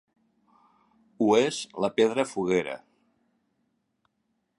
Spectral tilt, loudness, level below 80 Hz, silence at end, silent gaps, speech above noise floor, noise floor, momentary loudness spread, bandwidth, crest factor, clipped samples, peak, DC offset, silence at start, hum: -4.5 dB/octave; -26 LUFS; -70 dBFS; 1.8 s; none; 51 dB; -76 dBFS; 9 LU; 11 kHz; 20 dB; under 0.1%; -8 dBFS; under 0.1%; 1.2 s; none